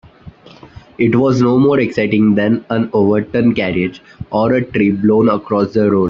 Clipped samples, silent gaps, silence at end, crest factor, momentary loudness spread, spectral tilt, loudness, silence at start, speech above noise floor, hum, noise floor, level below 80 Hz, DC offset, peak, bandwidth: under 0.1%; none; 0 s; 12 dB; 6 LU; -8.5 dB/octave; -14 LUFS; 0.25 s; 25 dB; none; -39 dBFS; -46 dBFS; under 0.1%; -2 dBFS; 7.2 kHz